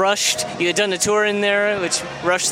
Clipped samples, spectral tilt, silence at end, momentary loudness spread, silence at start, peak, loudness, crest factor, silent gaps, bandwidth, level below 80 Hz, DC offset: under 0.1%; -2 dB/octave; 0 s; 4 LU; 0 s; -4 dBFS; -18 LUFS; 16 dB; none; 16.5 kHz; -56 dBFS; under 0.1%